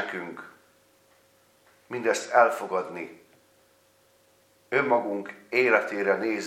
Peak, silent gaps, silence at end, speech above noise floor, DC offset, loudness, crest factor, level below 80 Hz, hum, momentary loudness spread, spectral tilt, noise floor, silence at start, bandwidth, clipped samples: -4 dBFS; none; 0 s; 37 dB; under 0.1%; -25 LUFS; 24 dB; -82 dBFS; none; 17 LU; -4 dB/octave; -63 dBFS; 0 s; 16 kHz; under 0.1%